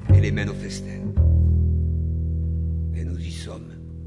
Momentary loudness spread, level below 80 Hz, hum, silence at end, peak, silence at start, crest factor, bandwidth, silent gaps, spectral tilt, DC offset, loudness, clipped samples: 15 LU; -30 dBFS; none; 0 s; -6 dBFS; 0 s; 16 dB; 10.5 kHz; none; -7.5 dB/octave; under 0.1%; -23 LUFS; under 0.1%